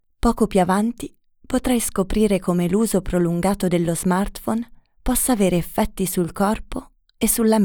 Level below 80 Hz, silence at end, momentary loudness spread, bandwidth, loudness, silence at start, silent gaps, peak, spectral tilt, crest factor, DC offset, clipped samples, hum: -36 dBFS; 0 s; 9 LU; over 20 kHz; -21 LUFS; 0.25 s; none; -4 dBFS; -5.5 dB/octave; 16 dB; under 0.1%; under 0.1%; none